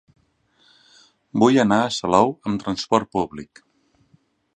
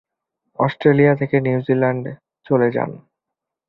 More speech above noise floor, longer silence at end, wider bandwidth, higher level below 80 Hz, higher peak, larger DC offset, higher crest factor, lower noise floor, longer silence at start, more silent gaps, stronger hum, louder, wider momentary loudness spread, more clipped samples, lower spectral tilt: second, 43 dB vs 66 dB; first, 1.1 s vs 0.7 s; first, 9.8 kHz vs 5.2 kHz; about the same, -56 dBFS vs -58 dBFS; about the same, -2 dBFS vs -2 dBFS; neither; about the same, 22 dB vs 18 dB; second, -62 dBFS vs -83 dBFS; first, 1.35 s vs 0.6 s; neither; neither; about the same, -20 LUFS vs -18 LUFS; about the same, 12 LU vs 13 LU; neither; second, -5.5 dB/octave vs -10.5 dB/octave